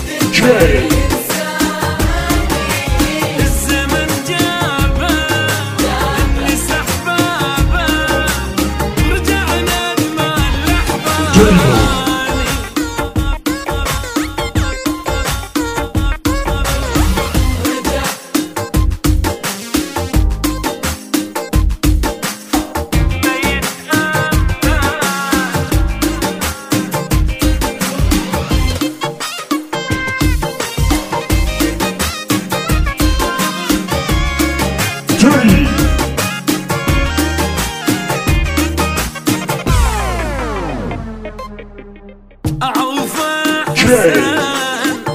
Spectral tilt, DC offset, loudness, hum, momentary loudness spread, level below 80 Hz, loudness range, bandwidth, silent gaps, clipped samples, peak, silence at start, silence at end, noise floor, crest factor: -4.5 dB/octave; 0.2%; -15 LUFS; none; 7 LU; -20 dBFS; 4 LU; 16 kHz; none; under 0.1%; 0 dBFS; 0 s; 0 s; -37 dBFS; 14 dB